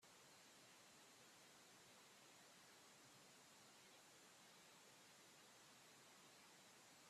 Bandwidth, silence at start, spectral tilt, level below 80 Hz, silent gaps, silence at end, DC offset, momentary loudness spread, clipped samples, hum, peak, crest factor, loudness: 14.5 kHz; 0 s; -1.5 dB/octave; under -90 dBFS; none; 0 s; under 0.1%; 0 LU; under 0.1%; none; -54 dBFS; 14 dB; -66 LUFS